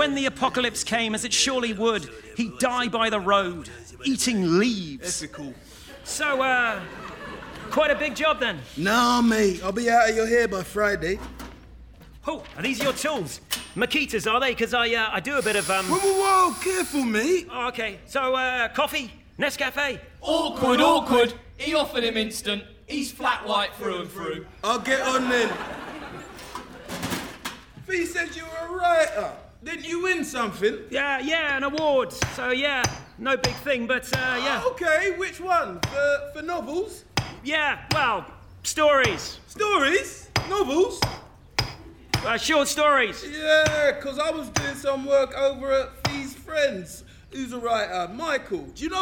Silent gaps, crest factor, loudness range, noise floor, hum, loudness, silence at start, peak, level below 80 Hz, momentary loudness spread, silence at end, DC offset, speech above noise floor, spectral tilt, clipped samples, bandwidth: none; 16 dB; 5 LU; -46 dBFS; none; -24 LUFS; 0 s; -8 dBFS; -50 dBFS; 14 LU; 0 s; under 0.1%; 22 dB; -3 dB/octave; under 0.1%; over 20 kHz